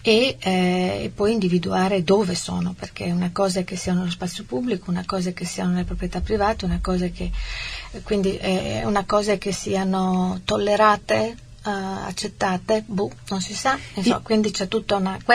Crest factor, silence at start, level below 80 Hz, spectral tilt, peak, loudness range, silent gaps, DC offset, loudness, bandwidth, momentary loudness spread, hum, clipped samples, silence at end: 20 dB; 0 s; -38 dBFS; -5 dB/octave; -2 dBFS; 4 LU; none; 0.2%; -23 LUFS; 13.5 kHz; 9 LU; none; under 0.1%; 0 s